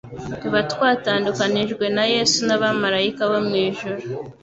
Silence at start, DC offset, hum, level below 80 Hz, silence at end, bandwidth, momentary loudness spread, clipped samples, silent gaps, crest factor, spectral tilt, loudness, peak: 0.05 s; under 0.1%; none; -56 dBFS; 0.1 s; 8.2 kHz; 11 LU; under 0.1%; none; 16 dB; -3.5 dB/octave; -20 LUFS; -4 dBFS